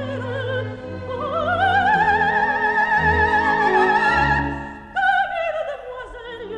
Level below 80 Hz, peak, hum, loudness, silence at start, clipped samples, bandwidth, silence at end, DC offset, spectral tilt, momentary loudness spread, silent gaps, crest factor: -40 dBFS; -6 dBFS; none; -19 LUFS; 0 s; under 0.1%; 9.8 kHz; 0 s; under 0.1%; -6 dB/octave; 15 LU; none; 14 dB